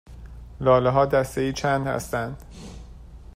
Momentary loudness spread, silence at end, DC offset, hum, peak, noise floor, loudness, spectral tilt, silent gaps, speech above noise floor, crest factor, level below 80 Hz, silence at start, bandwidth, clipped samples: 24 LU; 0.1 s; under 0.1%; none; -6 dBFS; -43 dBFS; -23 LUFS; -6 dB/octave; none; 20 dB; 20 dB; -42 dBFS; 0.1 s; 15.5 kHz; under 0.1%